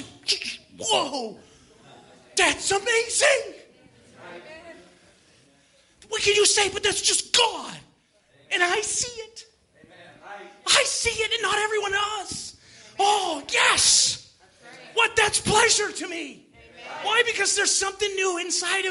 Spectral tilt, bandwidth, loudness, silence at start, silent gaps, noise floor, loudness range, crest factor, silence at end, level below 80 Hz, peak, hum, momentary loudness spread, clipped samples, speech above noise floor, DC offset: 0 dB/octave; 11.5 kHz; -21 LUFS; 0 s; none; -61 dBFS; 5 LU; 22 dB; 0 s; -58 dBFS; -4 dBFS; none; 21 LU; under 0.1%; 38 dB; under 0.1%